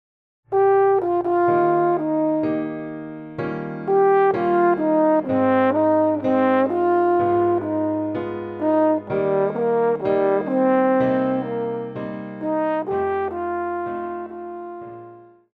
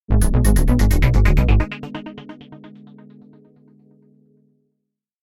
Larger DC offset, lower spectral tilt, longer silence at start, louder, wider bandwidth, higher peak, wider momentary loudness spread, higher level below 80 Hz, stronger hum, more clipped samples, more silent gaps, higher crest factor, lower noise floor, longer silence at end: neither; first, -9.5 dB/octave vs -6.5 dB/octave; first, 0.5 s vs 0.1 s; second, -20 LUFS vs -17 LUFS; second, 4.8 kHz vs 15.5 kHz; second, -6 dBFS vs -2 dBFS; second, 12 LU vs 23 LU; second, -60 dBFS vs -20 dBFS; neither; neither; neither; about the same, 14 dB vs 16 dB; second, -44 dBFS vs -78 dBFS; second, 0.35 s vs 2.55 s